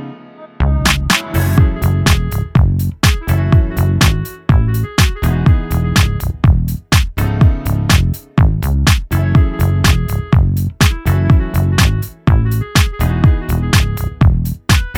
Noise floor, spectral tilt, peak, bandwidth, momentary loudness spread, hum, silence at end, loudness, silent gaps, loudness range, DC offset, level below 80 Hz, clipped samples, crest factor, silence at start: -36 dBFS; -5.5 dB/octave; 0 dBFS; 18.5 kHz; 4 LU; none; 0 s; -14 LUFS; none; 1 LU; under 0.1%; -18 dBFS; under 0.1%; 12 dB; 0 s